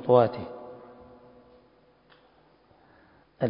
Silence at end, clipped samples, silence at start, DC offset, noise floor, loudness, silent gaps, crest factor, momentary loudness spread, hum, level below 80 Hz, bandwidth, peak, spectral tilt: 0 s; under 0.1%; 0 s; under 0.1%; -61 dBFS; -25 LUFS; none; 24 dB; 30 LU; none; -64 dBFS; 5.4 kHz; -6 dBFS; -11 dB/octave